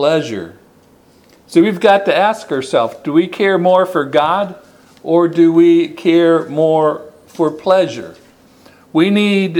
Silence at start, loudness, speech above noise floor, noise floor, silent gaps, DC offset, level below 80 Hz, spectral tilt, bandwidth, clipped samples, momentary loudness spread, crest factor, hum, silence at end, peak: 0 s; -13 LUFS; 35 dB; -48 dBFS; none; under 0.1%; -60 dBFS; -6.5 dB/octave; 11.5 kHz; under 0.1%; 11 LU; 14 dB; none; 0 s; 0 dBFS